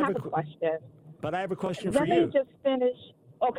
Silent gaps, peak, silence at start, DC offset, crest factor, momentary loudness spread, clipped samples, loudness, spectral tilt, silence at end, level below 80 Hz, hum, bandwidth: none; -12 dBFS; 0 s; under 0.1%; 16 dB; 10 LU; under 0.1%; -29 LUFS; -6.5 dB/octave; 0 s; -62 dBFS; none; 13 kHz